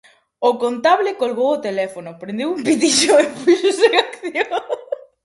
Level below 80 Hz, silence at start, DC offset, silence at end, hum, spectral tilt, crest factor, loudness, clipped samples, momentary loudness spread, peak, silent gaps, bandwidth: -64 dBFS; 0.4 s; under 0.1%; 0.3 s; none; -2.5 dB/octave; 18 dB; -17 LUFS; under 0.1%; 13 LU; 0 dBFS; none; 11.5 kHz